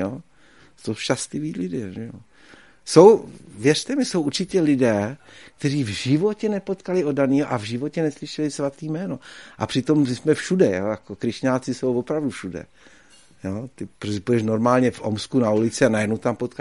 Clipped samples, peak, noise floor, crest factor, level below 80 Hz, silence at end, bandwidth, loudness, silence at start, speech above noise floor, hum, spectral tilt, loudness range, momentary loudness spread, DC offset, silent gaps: under 0.1%; 0 dBFS; -54 dBFS; 22 dB; -58 dBFS; 0.1 s; 11.5 kHz; -22 LUFS; 0 s; 33 dB; none; -6 dB/octave; 6 LU; 14 LU; 0.2%; none